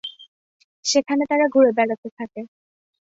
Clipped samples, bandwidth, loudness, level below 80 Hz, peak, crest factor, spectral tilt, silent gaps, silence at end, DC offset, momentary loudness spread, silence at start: under 0.1%; 8 kHz; -19 LUFS; -70 dBFS; -4 dBFS; 18 dB; -2.5 dB/octave; 0.28-0.83 s, 1.98-2.03 s, 2.12-2.17 s; 0.6 s; under 0.1%; 19 LU; 0.05 s